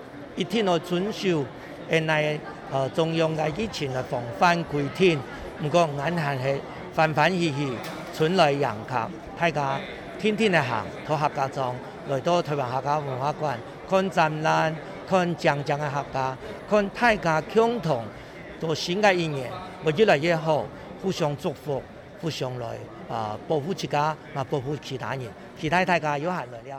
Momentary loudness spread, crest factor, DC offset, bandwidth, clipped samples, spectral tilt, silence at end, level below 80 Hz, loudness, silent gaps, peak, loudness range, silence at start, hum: 12 LU; 16 dB; under 0.1%; 18 kHz; under 0.1%; -5.5 dB/octave; 0 s; -54 dBFS; -25 LUFS; none; -8 dBFS; 5 LU; 0 s; none